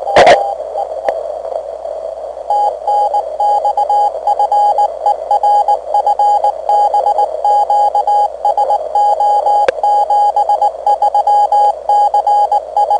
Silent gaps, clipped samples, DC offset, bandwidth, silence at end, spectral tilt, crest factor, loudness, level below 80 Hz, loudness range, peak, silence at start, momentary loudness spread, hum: none; under 0.1%; under 0.1%; 10 kHz; 0 s; -3 dB/octave; 12 dB; -12 LUFS; -50 dBFS; 4 LU; 0 dBFS; 0 s; 9 LU; 60 Hz at -50 dBFS